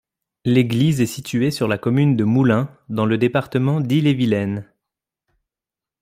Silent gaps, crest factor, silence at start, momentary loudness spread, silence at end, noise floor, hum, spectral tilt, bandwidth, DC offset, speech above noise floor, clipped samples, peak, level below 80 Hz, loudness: none; 16 dB; 0.45 s; 6 LU; 1.4 s; -89 dBFS; none; -7 dB/octave; 15.5 kHz; under 0.1%; 71 dB; under 0.1%; -4 dBFS; -58 dBFS; -19 LUFS